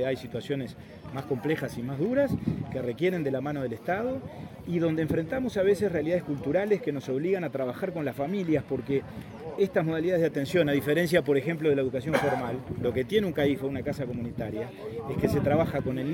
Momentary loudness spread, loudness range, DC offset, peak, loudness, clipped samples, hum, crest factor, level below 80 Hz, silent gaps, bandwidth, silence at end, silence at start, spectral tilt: 9 LU; 4 LU; under 0.1%; -8 dBFS; -28 LUFS; under 0.1%; none; 20 dB; -54 dBFS; none; 17 kHz; 0 s; 0 s; -7 dB/octave